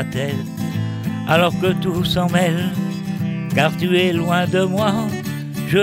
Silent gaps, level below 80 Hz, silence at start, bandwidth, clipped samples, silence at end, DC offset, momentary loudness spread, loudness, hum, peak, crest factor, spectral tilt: none; -46 dBFS; 0 s; 16 kHz; under 0.1%; 0 s; under 0.1%; 8 LU; -19 LUFS; none; -4 dBFS; 14 dB; -6 dB/octave